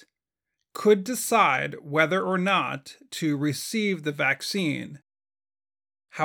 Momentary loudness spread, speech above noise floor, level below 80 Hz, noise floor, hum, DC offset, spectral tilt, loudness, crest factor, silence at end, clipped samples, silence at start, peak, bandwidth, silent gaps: 14 LU; 62 dB; -76 dBFS; -87 dBFS; none; under 0.1%; -4.5 dB/octave; -25 LUFS; 22 dB; 0 s; under 0.1%; 0.75 s; -6 dBFS; 19 kHz; none